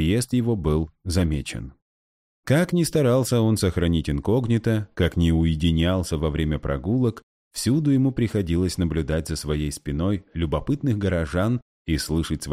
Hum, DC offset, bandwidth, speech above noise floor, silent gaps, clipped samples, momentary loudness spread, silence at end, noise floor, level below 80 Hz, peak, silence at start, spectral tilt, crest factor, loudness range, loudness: none; under 0.1%; 15.5 kHz; over 68 dB; 1.82-2.43 s, 7.23-7.51 s, 11.62-11.85 s; under 0.1%; 7 LU; 0 s; under -90 dBFS; -36 dBFS; -8 dBFS; 0 s; -6.5 dB/octave; 14 dB; 3 LU; -23 LUFS